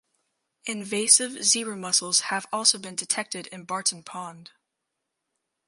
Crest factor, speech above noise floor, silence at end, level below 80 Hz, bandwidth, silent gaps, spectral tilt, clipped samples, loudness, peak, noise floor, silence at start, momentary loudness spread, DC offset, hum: 24 dB; 56 dB; 1.25 s; -82 dBFS; 12 kHz; none; -0.5 dB/octave; under 0.1%; -23 LUFS; -4 dBFS; -82 dBFS; 0.65 s; 19 LU; under 0.1%; none